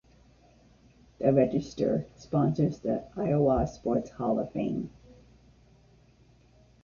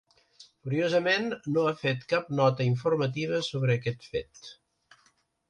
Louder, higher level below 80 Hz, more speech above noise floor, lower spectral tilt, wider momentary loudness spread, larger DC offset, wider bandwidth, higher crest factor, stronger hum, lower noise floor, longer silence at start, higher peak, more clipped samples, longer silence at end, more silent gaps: about the same, -29 LUFS vs -28 LUFS; first, -52 dBFS vs -64 dBFS; second, 32 dB vs 40 dB; first, -9 dB/octave vs -6.5 dB/octave; second, 8 LU vs 11 LU; neither; second, 7.2 kHz vs 9.6 kHz; about the same, 22 dB vs 18 dB; neither; second, -60 dBFS vs -68 dBFS; first, 1.2 s vs 0.4 s; about the same, -8 dBFS vs -10 dBFS; neither; first, 1.95 s vs 0.95 s; neither